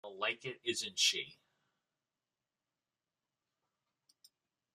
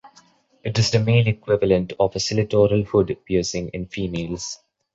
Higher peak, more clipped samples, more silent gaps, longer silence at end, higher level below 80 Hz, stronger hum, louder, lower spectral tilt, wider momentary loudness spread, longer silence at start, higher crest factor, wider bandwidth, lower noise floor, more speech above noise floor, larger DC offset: second, -18 dBFS vs -4 dBFS; neither; neither; first, 3.4 s vs 0.4 s; second, -90 dBFS vs -44 dBFS; neither; second, -35 LUFS vs -21 LUFS; second, -0.5 dB/octave vs -5.5 dB/octave; about the same, 10 LU vs 12 LU; about the same, 0.05 s vs 0.05 s; first, 24 dB vs 18 dB; first, 14.5 kHz vs 8 kHz; first, under -90 dBFS vs -55 dBFS; first, over 53 dB vs 35 dB; neither